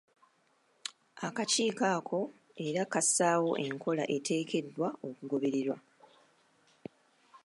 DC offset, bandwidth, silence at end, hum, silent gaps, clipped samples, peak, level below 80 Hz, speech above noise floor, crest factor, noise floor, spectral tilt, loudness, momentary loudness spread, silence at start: under 0.1%; 11.5 kHz; 0.1 s; none; none; under 0.1%; -14 dBFS; -86 dBFS; 39 dB; 20 dB; -71 dBFS; -3.5 dB/octave; -32 LUFS; 16 LU; 0.85 s